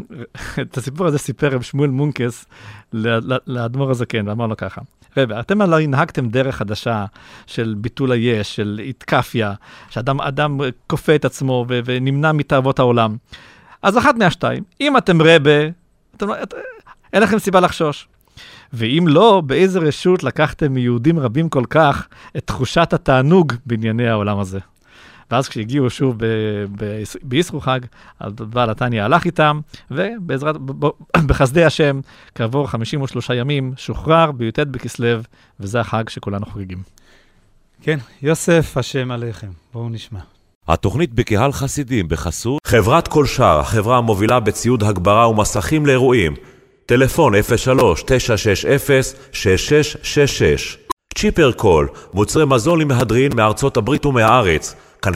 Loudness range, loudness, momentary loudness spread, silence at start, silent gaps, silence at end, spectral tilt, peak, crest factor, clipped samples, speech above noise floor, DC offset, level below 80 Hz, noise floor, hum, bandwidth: 6 LU; -17 LUFS; 13 LU; 0 s; 40.55-40.61 s, 50.92-50.97 s; 0 s; -5.5 dB/octave; 0 dBFS; 16 dB; under 0.1%; 37 dB; under 0.1%; -36 dBFS; -53 dBFS; none; 16 kHz